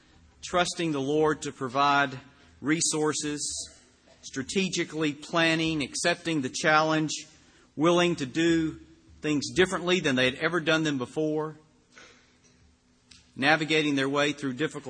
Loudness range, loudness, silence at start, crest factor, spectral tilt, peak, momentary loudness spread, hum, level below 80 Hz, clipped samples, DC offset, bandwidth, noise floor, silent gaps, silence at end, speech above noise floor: 4 LU; -26 LUFS; 0.45 s; 22 dB; -4 dB/octave; -6 dBFS; 11 LU; none; -60 dBFS; under 0.1%; under 0.1%; 10 kHz; -62 dBFS; none; 0 s; 36 dB